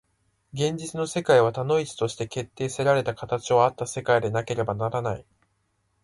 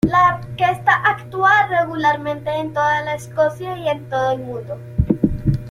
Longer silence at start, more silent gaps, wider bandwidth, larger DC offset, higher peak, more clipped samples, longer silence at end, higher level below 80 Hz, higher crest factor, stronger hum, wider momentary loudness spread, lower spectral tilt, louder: first, 0.55 s vs 0.05 s; neither; second, 11.5 kHz vs 15.5 kHz; neither; second, -6 dBFS vs -2 dBFS; neither; first, 0.85 s vs 0 s; second, -58 dBFS vs -36 dBFS; about the same, 20 dB vs 16 dB; neither; about the same, 11 LU vs 10 LU; second, -5 dB/octave vs -6.5 dB/octave; second, -25 LUFS vs -18 LUFS